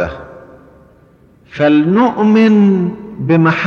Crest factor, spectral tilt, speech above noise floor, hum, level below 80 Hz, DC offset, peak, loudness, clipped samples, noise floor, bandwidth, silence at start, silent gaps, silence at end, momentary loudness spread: 12 dB; -8.5 dB/octave; 36 dB; none; -44 dBFS; under 0.1%; -2 dBFS; -12 LUFS; under 0.1%; -47 dBFS; 6.6 kHz; 0 s; none; 0 s; 14 LU